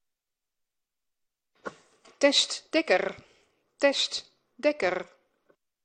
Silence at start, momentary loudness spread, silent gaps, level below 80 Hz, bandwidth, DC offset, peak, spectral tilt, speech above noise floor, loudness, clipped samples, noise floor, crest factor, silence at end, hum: 1.65 s; 21 LU; none; -74 dBFS; 10 kHz; under 0.1%; -8 dBFS; -1.5 dB/octave; 59 dB; -26 LUFS; under 0.1%; -85 dBFS; 24 dB; 0.8 s; none